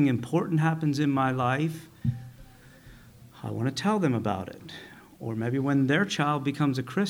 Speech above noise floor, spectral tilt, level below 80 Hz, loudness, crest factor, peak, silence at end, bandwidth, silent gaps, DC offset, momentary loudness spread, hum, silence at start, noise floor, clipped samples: 24 dB; -6.5 dB/octave; -60 dBFS; -27 LUFS; 16 dB; -10 dBFS; 0 s; 16.5 kHz; none; under 0.1%; 16 LU; none; 0 s; -51 dBFS; under 0.1%